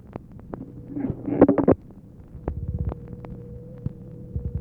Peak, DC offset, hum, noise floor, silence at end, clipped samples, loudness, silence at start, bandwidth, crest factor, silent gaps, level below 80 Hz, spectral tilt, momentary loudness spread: -2 dBFS; under 0.1%; none; -45 dBFS; 0 s; under 0.1%; -25 LUFS; 0.05 s; 3.3 kHz; 24 dB; none; -40 dBFS; -12 dB/octave; 22 LU